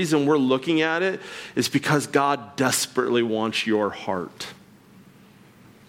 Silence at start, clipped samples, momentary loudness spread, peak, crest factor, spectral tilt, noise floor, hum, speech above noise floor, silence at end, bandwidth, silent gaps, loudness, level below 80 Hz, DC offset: 0 s; under 0.1%; 10 LU; -6 dBFS; 18 dB; -4 dB/octave; -51 dBFS; none; 28 dB; 1.35 s; 17 kHz; none; -23 LUFS; -68 dBFS; under 0.1%